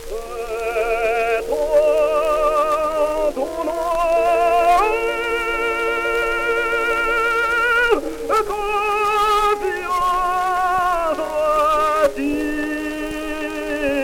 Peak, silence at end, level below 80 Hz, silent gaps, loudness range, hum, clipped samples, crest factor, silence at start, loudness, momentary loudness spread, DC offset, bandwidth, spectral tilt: -4 dBFS; 0 s; -38 dBFS; none; 1 LU; none; under 0.1%; 16 dB; 0 s; -19 LUFS; 7 LU; under 0.1%; 17.5 kHz; -3.5 dB/octave